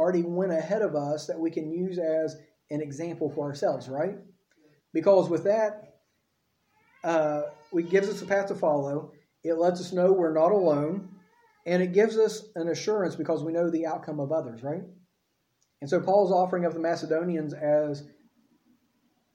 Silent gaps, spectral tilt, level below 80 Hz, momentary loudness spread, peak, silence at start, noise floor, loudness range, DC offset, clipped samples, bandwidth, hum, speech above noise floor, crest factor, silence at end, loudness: none; -6.5 dB/octave; -76 dBFS; 12 LU; -10 dBFS; 0 s; -75 dBFS; 5 LU; under 0.1%; under 0.1%; 11.5 kHz; none; 49 dB; 18 dB; 1.3 s; -27 LUFS